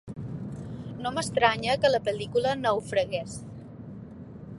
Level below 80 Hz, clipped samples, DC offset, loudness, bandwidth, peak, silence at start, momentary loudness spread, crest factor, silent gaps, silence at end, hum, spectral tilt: -54 dBFS; under 0.1%; under 0.1%; -27 LUFS; 11.5 kHz; -6 dBFS; 0.05 s; 20 LU; 24 dB; none; 0 s; none; -4.5 dB/octave